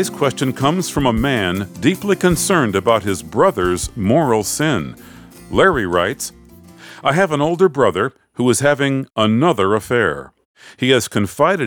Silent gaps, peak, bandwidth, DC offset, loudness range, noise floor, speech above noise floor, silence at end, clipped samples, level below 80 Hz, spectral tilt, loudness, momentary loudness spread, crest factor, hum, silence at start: 10.45-10.54 s; -2 dBFS; over 20 kHz; under 0.1%; 2 LU; -41 dBFS; 25 dB; 0 s; under 0.1%; -40 dBFS; -5 dB/octave; -17 LUFS; 7 LU; 16 dB; none; 0 s